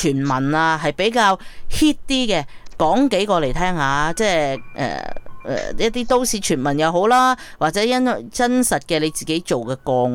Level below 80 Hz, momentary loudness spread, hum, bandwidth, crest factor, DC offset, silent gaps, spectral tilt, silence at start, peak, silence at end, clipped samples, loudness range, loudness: -36 dBFS; 9 LU; none; 17.5 kHz; 14 dB; under 0.1%; none; -4 dB/octave; 0 s; -4 dBFS; 0 s; under 0.1%; 2 LU; -19 LUFS